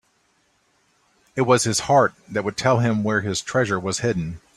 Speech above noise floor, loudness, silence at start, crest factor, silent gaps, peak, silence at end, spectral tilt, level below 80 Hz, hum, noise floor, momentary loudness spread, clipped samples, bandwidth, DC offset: 44 dB; -21 LUFS; 1.35 s; 20 dB; none; -2 dBFS; 0.2 s; -4.5 dB/octave; -54 dBFS; none; -65 dBFS; 8 LU; under 0.1%; 14 kHz; under 0.1%